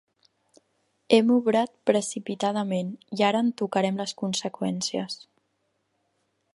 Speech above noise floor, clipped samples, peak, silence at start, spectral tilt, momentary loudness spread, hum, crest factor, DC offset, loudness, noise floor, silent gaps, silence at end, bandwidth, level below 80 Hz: 49 dB; under 0.1%; -4 dBFS; 1.1 s; -4.5 dB/octave; 10 LU; none; 22 dB; under 0.1%; -25 LUFS; -74 dBFS; none; 1.4 s; 11.5 kHz; -74 dBFS